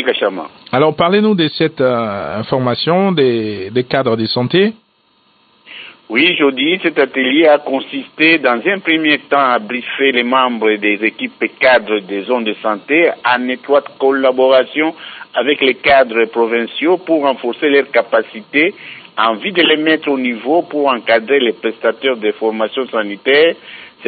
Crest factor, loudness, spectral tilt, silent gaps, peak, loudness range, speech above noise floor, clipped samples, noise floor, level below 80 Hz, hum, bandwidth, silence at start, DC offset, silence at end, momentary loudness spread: 14 dB; -14 LUFS; -9.5 dB/octave; none; 0 dBFS; 3 LU; 42 dB; under 0.1%; -56 dBFS; -58 dBFS; none; 4.9 kHz; 0 s; under 0.1%; 0 s; 8 LU